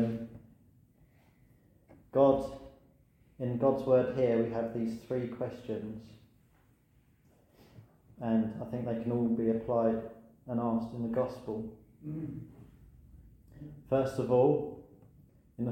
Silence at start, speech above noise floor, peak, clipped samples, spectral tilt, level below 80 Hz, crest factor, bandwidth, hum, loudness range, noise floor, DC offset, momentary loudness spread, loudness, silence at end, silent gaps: 0 s; 36 dB; -12 dBFS; under 0.1%; -9 dB/octave; -62 dBFS; 22 dB; 9.6 kHz; none; 9 LU; -67 dBFS; under 0.1%; 21 LU; -32 LUFS; 0 s; none